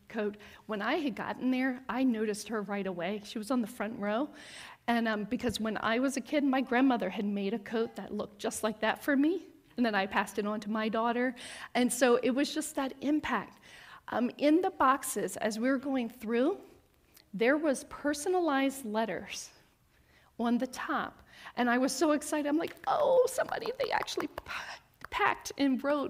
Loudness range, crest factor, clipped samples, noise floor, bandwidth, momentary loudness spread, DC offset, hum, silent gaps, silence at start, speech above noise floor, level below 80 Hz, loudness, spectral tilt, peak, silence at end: 3 LU; 20 dB; under 0.1%; -66 dBFS; 16 kHz; 12 LU; under 0.1%; none; none; 0.1 s; 35 dB; -66 dBFS; -32 LUFS; -4 dB/octave; -12 dBFS; 0 s